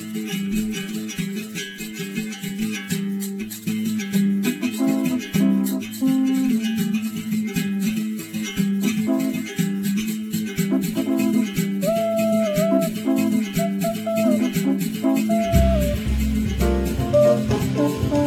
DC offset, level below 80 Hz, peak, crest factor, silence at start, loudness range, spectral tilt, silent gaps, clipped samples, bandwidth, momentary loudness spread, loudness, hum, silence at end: under 0.1%; -34 dBFS; -4 dBFS; 18 dB; 0 s; 5 LU; -6 dB/octave; none; under 0.1%; 17.5 kHz; 8 LU; -22 LUFS; none; 0 s